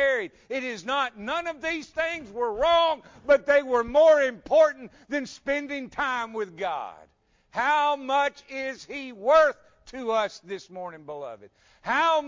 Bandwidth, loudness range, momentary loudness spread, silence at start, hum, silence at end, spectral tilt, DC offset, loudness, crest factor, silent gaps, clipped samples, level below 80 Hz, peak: 7.6 kHz; 6 LU; 18 LU; 0 s; none; 0 s; -3 dB/octave; under 0.1%; -25 LUFS; 16 dB; none; under 0.1%; -58 dBFS; -10 dBFS